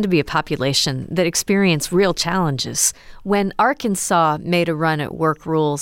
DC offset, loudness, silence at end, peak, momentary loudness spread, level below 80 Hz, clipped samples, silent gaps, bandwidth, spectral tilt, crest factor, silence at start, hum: under 0.1%; -18 LUFS; 0 s; -4 dBFS; 4 LU; -46 dBFS; under 0.1%; none; 17 kHz; -4 dB/octave; 14 dB; 0 s; none